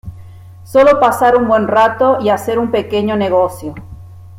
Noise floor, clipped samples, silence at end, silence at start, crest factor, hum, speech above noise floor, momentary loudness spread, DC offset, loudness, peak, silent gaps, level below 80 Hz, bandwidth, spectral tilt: -35 dBFS; under 0.1%; 0 s; 0.05 s; 12 dB; none; 23 dB; 14 LU; under 0.1%; -12 LUFS; 0 dBFS; none; -44 dBFS; 16 kHz; -6 dB/octave